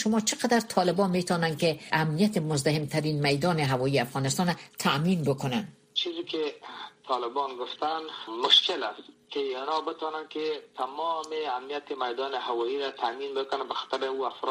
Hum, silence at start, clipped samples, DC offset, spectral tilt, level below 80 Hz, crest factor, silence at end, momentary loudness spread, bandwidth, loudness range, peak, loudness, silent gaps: none; 0 s; under 0.1%; under 0.1%; -4.5 dB/octave; -66 dBFS; 20 dB; 0 s; 9 LU; 15.5 kHz; 6 LU; -8 dBFS; -28 LUFS; none